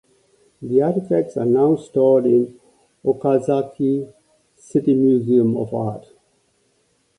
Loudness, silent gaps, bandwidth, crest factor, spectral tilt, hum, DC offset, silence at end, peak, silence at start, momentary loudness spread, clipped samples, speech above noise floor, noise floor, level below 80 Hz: -19 LUFS; none; 10.5 kHz; 16 dB; -9.5 dB/octave; none; under 0.1%; 1.2 s; -4 dBFS; 0.6 s; 10 LU; under 0.1%; 46 dB; -64 dBFS; -62 dBFS